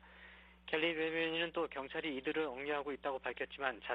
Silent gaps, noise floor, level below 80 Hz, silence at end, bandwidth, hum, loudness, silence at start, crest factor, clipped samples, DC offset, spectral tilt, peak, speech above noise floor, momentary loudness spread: none; -59 dBFS; -68 dBFS; 0 s; 5.2 kHz; none; -39 LUFS; 0.05 s; 20 dB; under 0.1%; under 0.1%; -6.5 dB/octave; -20 dBFS; 20 dB; 13 LU